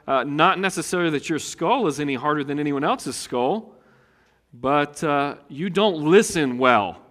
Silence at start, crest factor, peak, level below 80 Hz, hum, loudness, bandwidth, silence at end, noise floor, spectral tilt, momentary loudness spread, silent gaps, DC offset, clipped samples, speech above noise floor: 0.05 s; 22 dB; 0 dBFS; -60 dBFS; none; -22 LUFS; 15.5 kHz; 0.15 s; -60 dBFS; -4.5 dB/octave; 9 LU; none; under 0.1%; under 0.1%; 39 dB